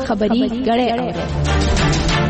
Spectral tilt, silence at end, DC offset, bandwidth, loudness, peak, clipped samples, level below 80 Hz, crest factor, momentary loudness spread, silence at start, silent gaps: -5.5 dB/octave; 0 s; under 0.1%; 8.8 kHz; -17 LUFS; -6 dBFS; under 0.1%; -24 dBFS; 10 dB; 5 LU; 0 s; none